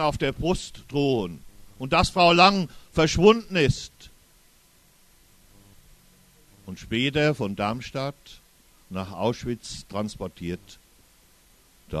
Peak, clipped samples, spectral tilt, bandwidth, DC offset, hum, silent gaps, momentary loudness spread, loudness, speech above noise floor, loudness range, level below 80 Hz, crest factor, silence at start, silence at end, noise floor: -2 dBFS; under 0.1%; -5 dB/octave; 13.5 kHz; under 0.1%; none; none; 17 LU; -24 LUFS; 34 dB; 12 LU; -44 dBFS; 24 dB; 0 s; 0 s; -58 dBFS